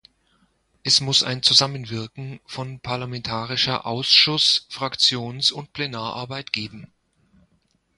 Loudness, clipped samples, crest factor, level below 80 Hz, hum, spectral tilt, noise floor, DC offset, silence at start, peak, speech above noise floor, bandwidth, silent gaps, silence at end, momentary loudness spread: -20 LUFS; under 0.1%; 22 dB; -58 dBFS; none; -2.5 dB/octave; -66 dBFS; under 0.1%; 0.85 s; -2 dBFS; 43 dB; 11.5 kHz; none; 1.1 s; 16 LU